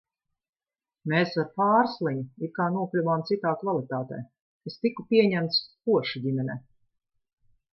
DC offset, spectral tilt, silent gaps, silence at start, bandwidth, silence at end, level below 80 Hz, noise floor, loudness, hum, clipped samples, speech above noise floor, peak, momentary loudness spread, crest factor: under 0.1%; -8 dB/octave; 4.41-4.60 s; 1.05 s; 6 kHz; 1.15 s; -72 dBFS; under -90 dBFS; -26 LUFS; none; under 0.1%; over 64 dB; -8 dBFS; 15 LU; 20 dB